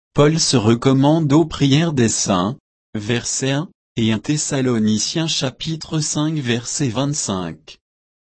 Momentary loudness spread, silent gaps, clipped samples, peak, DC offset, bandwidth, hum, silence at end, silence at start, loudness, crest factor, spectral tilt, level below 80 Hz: 10 LU; 2.60-2.93 s, 3.75-3.95 s; under 0.1%; -2 dBFS; under 0.1%; 8.8 kHz; none; 0.55 s; 0.15 s; -18 LUFS; 16 dB; -4.5 dB/octave; -46 dBFS